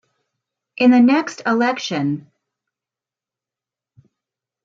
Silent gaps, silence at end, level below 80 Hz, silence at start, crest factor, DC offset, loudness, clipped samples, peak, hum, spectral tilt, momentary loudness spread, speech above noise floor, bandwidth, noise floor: none; 2.45 s; -72 dBFS; 0.8 s; 18 dB; under 0.1%; -17 LUFS; under 0.1%; -4 dBFS; none; -5.5 dB/octave; 11 LU; 73 dB; 7.6 kHz; -89 dBFS